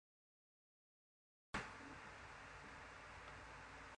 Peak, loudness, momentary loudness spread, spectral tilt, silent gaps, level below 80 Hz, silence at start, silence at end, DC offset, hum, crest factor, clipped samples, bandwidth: -32 dBFS; -54 LUFS; 7 LU; -4 dB/octave; none; -70 dBFS; 1.55 s; 0 s; under 0.1%; none; 24 dB; under 0.1%; 10.5 kHz